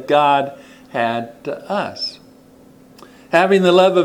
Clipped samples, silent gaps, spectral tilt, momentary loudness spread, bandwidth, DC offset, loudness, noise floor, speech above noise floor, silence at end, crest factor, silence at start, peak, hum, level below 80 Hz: under 0.1%; none; -5.5 dB/octave; 15 LU; 14 kHz; under 0.1%; -17 LUFS; -46 dBFS; 31 dB; 0 s; 18 dB; 0 s; 0 dBFS; none; -62 dBFS